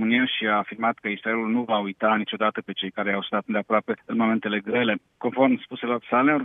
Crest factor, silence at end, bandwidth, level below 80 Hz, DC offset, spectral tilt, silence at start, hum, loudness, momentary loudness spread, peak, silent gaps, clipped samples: 18 dB; 0 s; 3.9 kHz; -72 dBFS; under 0.1%; -8 dB/octave; 0 s; none; -24 LUFS; 7 LU; -6 dBFS; none; under 0.1%